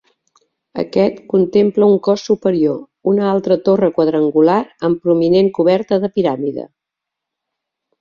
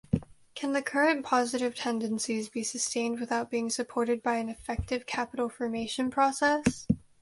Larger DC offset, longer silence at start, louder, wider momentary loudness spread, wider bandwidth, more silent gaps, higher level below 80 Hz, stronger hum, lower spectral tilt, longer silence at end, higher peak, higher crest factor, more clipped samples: neither; first, 0.75 s vs 0.15 s; first, -15 LUFS vs -30 LUFS; about the same, 9 LU vs 7 LU; second, 7 kHz vs 11.5 kHz; neither; second, -58 dBFS vs -50 dBFS; neither; first, -7.5 dB/octave vs -4 dB/octave; first, 1.35 s vs 0.25 s; first, -2 dBFS vs -10 dBFS; second, 14 dB vs 20 dB; neither